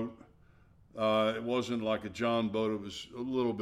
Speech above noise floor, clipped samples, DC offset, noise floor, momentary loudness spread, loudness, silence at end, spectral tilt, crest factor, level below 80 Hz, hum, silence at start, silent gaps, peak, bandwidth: 29 dB; under 0.1%; under 0.1%; -61 dBFS; 11 LU; -33 LUFS; 0 s; -5.5 dB/octave; 16 dB; -66 dBFS; none; 0 s; none; -18 dBFS; 12.5 kHz